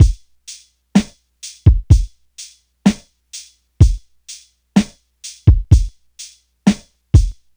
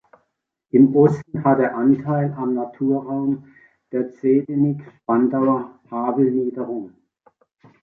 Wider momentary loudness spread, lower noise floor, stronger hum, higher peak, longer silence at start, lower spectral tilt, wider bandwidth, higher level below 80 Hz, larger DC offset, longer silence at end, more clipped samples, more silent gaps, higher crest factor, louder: first, 21 LU vs 13 LU; second, -40 dBFS vs -74 dBFS; first, 60 Hz at -40 dBFS vs none; first, 0 dBFS vs -4 dBFS; second, 0 s vs 0.75 s; second, -6.5 dB/octave vs -11 dB/octave; first, over 20 kHz vs 2.7 kHz; first, -20 dBFS vs -62 dBFS; neither; second, 0.25 s vs 0.95 s; neither; neither; about the same, 16 dB vs 18 dB; first, -16 LUFS vs -20 LUFS